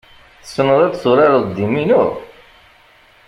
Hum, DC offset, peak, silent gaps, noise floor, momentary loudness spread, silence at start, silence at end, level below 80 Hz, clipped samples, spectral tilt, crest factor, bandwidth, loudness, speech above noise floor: none; under 0.1%; -2 dBFS; none; -49 dBFS; 9 LU; 0.45 s; 1 s; -52 dBFS; under 0.1%; -7 dB/octave; 16 dB; 11.5 kHz; -14 LUFS; 35 dB